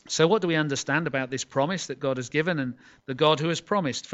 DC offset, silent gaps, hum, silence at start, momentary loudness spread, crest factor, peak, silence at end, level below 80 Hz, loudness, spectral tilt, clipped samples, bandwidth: under 0.1%; none; none; 0.05 s; 8 LU; 20 dB; -6 dBFS; 0 s; -66 dBFS; -26 LUFS; -4.5 dB/octave; under 0.1%; 8.2 kHz